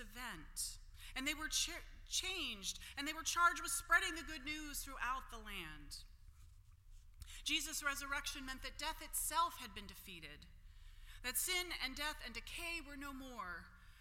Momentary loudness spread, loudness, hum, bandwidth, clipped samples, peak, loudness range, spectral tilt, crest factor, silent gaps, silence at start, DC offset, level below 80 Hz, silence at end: 18 LU; -41 LUFS; none; 16.5 kHz; under 0.1%; -20 dBFS; 6 LU; -0.5 dB/octave; 24 dB; none; 0 s; under 0.1%; -56 dBFS; 0 s